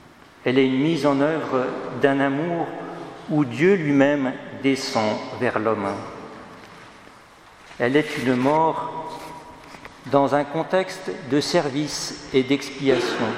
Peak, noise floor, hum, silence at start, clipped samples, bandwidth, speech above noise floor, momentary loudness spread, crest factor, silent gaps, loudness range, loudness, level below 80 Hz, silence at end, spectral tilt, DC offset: -2 dBFS; -48 dBFS; none; 0.4 s; under 0.1%; 14.5 kHz; 26 dB; 18 LU; 22 dB; none; 4 LU; -22 LUFS; -60 dBFS; 0 s; -5.5 dB/octave; under 0.1%